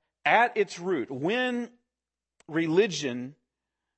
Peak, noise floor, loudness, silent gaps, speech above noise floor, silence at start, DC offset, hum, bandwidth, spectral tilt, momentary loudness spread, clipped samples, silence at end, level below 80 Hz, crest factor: -8 dBFS; under -90 dBFS; -27 LUFS; none; over 63 dB; 0.25 s; under 0.1%; none; 8.6 kHz; -4.5 dB/octave; 13 LU; under 0.1%; 0.65 s; -80 dBFS; 22 dB